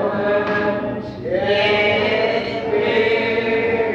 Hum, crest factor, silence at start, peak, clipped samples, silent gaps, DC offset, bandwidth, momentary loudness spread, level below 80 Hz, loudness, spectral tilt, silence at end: none; 12 dB; 0 s; -6 dBFS; under 0.1%; none; under 0.1%; 7 kHz; 7 LU; -50 dBFS; -18 LUFS; -6 dB/octave; 0 s